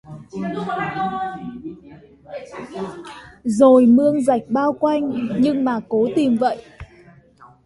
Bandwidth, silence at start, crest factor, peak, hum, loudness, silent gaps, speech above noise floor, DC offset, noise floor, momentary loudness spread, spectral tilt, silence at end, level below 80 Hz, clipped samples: 11.5 kHz; 0.1 s; 18 dB; -2 dBFS; none; -18 LUFS; none; 30 dB; under 0.1%; -49 dBFS; 21 LU; -7 dB/octave; 0.2 s; -54 dBFS; under 0.1%